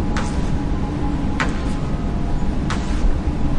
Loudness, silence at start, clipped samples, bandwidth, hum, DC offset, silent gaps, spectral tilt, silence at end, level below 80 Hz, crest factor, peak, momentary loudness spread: -23 LUFS; 0 s; under 0.1%; 10.5 kHz; none; under 0.1%; none; -6.5 dB/octave; 0 s; -22 dBFS; 14 dB; -4 dBFS; 2 LU